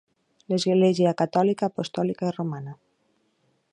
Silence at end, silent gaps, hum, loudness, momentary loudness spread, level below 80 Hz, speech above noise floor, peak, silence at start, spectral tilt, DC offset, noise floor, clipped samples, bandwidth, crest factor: 1 s; none; none; -24 LUFS; 11 LU; -70 dBFS; 46 dB; -8 dBFS; 0.5 s; -6.5 dB/octave; under 0.1%; -69 dBFS; under 0.1%; 10 kHz; 18 dB